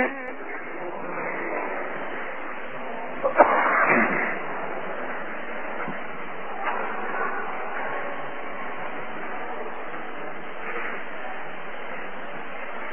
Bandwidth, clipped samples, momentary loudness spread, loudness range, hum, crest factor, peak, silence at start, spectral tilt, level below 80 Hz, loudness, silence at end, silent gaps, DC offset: 3.6 kHz; under 0.1%; 15 LU; 10 LU; none; 28 dB; 0 dBFS; 0 s; -7.5 dB/octave; -62 dBFS; -28 LUFS; 0 s; none; 3%